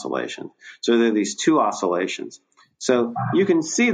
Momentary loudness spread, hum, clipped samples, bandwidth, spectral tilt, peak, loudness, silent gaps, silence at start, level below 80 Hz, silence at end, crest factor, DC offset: 13 LU; none; under 0.1%; 9.6 kHz; -4.5 dB/octave; -6 dBFS; -21 LUFS; none; 0 s; -70 dBFS; 0 s; 16 dB; under 0.1%